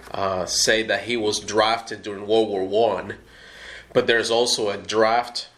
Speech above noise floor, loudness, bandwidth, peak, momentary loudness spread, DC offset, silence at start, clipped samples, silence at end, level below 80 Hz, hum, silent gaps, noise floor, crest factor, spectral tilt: 20 dB; -21 LUFS; 15 kHz; -4 dBFS; 13 LU; under 0.1%; 0 s; under 0.1%; 0.1 s; -56 dBFS; none; none; -42 dBFS; 20 dB; -2.5 dB/octave